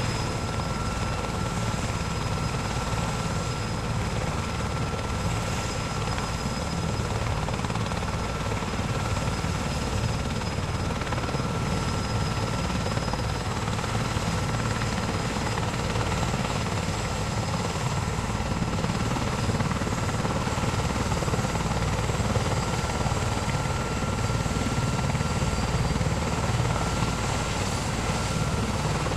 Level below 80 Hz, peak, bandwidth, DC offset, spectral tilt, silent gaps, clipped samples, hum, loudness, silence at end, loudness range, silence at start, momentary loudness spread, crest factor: -36 dBFS; -12 dBFS; 15 kHz; under 0.1%; -5 dB/octave; none; under 0.1%; none; -28 LUFS; 0 s; 2 LU; 0 s; 3 LU; 16 dB